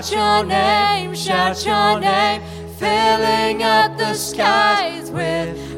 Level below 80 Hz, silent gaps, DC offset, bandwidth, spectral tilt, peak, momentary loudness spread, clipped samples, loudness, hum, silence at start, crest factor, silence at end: -44 dBFS; none; under 0.1%; 16.5 kHz; -3.5 dB/octave; -2 dBFS; 8 LU; under 0.1%; -17 LUFS; none; 0 s; 14 dB; 0 s